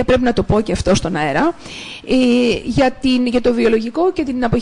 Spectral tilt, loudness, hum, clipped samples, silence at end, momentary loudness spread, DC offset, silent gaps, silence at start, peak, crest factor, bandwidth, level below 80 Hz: -5.5 dB/octave; -16 LUFS; none; under 0.1%; 0 s; 5 LU; under 0.1%; none; 0 s; -4 dBFS; 10 dB; 10.5 kHz; -34 dBFS